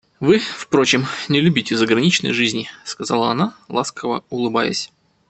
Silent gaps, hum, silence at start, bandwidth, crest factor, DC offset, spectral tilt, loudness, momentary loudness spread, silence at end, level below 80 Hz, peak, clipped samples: none; none; 0.2 s; 8.8 kHz; 18 dB; under 0.1%; -4.5 dB/octave; -18 LUFS; 10 LU; 0.45 s; -58 dBFS; 0 dBFS; under 0.1%